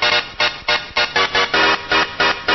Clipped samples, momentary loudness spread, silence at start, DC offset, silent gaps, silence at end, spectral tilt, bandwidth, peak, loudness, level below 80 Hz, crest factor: under 0.1%; 4 LU; 0 s; under 0.1%; none; 0 s; -2 dB/octave; 6.2 kHz; -4 dBFS; -16 LUFS; -46 dBFS; 14 dB